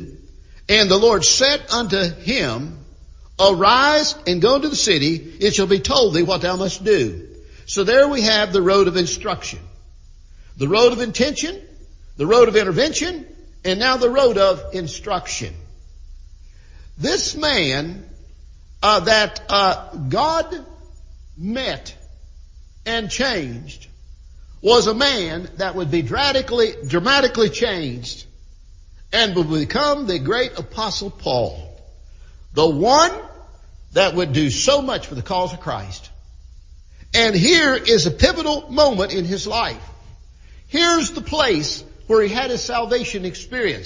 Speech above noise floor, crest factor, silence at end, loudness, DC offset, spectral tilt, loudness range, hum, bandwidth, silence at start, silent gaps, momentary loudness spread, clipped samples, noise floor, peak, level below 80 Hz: 25 dB; 20 dB; 0 s; -18 LUFS; under 0.1%; -3.5 dB/octave; 6 LU; none; 7.6 kHz; 0 s; none; 14 LU; under 0.1%; -43 dBFS; 0 dBFS; -40 dBFS